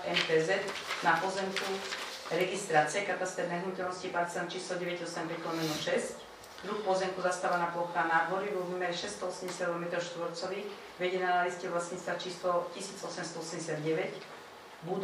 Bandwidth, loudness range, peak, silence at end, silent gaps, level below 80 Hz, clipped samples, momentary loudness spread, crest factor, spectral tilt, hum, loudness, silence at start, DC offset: 15.5 kHz; 3 LU; -12 dBFS; 0 s; none; -76 dBFS; under 0.1%; 10 LU; 22 dB; -3.5 dB/octave; none; -33 LUFS; 0 s; under 0.1%